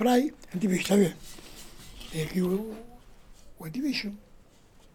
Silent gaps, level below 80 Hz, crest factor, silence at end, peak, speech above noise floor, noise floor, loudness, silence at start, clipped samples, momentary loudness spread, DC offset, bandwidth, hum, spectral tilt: none; -52 dBFS; 20 dB; 0.75 s; -10 dBFS; 28 dB; -56 dBFS; -29 LUFS; 0 s; under 0.1%; 22 LU; under 0.1%; 18 kHz; none; -5.5 dB/octave